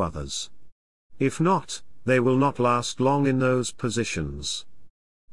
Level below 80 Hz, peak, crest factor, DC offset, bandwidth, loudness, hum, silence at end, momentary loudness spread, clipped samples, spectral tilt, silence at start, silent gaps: -50 dBFS; -8 dBFS; 16 dB; 0.8%; 12 kHz; -25 LUFS; none; 0.4 s; 10 LU; under 0.1%; -5 dB/octave; 0 s; 0.72-1.10 s